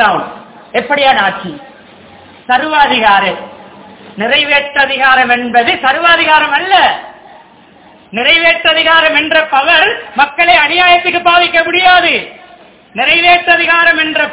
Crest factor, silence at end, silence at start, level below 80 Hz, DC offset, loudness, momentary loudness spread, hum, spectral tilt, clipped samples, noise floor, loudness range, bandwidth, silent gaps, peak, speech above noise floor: 10 dB; 0 s; 0 s; -46 dBFS; under 0.1%; -8 LUFS; 11 LU; none; -6 dB/octave; 2%; -40 dBFS; 4 LU; 4 kHz; none; 0 dBFS; 31 dB